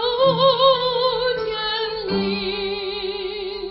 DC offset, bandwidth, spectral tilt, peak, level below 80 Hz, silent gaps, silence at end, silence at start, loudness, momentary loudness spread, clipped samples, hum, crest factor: under 0.1%; 5.8 kHz; -9 dB/octave; -4 dBFS; -48 dBFS; none; 0 s; 0 s; -20 LUFS; 11 LU; under 0.1%; none; 18 dB